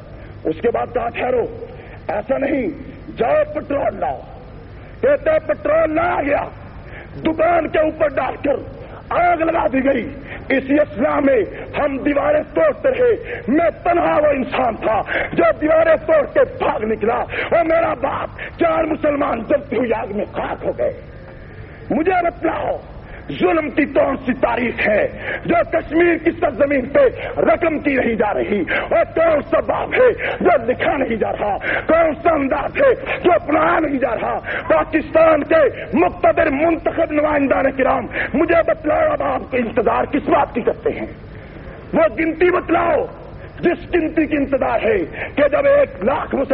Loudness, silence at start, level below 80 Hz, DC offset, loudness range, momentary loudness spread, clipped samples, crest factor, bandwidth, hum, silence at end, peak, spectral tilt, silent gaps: -17 LUFS; 0 s; -40 dBFS; under 0.1%; 5 LU; 10 LU; under 0.1%; 14 dB; 4.9 kHz; 50 Hz at -40 dBFS; 0 s; -4 dBFS; -4.5 dB/octave; none